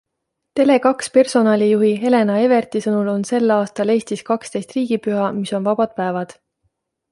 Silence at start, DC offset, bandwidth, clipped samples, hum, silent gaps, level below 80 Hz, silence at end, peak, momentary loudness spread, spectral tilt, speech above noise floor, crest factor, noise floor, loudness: 0.55 s; under 0.1%; 11.5 kHz; under 0.1%; none; none; -64 dBFS; 0.8 s; -2 dBFS; 8 LU; -6 dB/octave; 60 dB; 16 dB; -77 dBFS; -18 LUFS